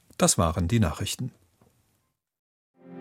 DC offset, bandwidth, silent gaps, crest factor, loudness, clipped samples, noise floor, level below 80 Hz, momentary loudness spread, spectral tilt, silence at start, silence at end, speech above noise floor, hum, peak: under 0.1%; 16 kHz; 2.39-2.74 s; 22 dB; -25 LUFS; under 0.1%; -74 dBFS; -44 dBFS; 12 LU; -4.5 dB/octave; 0.2 s; 0 s; 49 dB; none; -6 dBFS